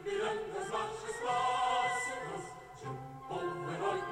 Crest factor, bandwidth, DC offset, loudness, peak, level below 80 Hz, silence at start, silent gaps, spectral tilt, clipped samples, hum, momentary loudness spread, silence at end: 16 dB; 15.5 kHz; under 0.1%; -36 LUFS; -20 dBFS; -66 dBFS; 0 s; none; -3.5 dB/octave; under 0.1%; none; 13 LU; 0 s